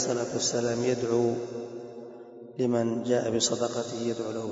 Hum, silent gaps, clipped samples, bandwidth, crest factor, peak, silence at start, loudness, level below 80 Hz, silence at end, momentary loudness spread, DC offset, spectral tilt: none; none; under 0.1%; 8 kHz; 16 dB; -12 dBFS; 0 s; -28 LUFS; -70 dBFS; 0 s; 16 LU; under 0.1%; -4 dB/octave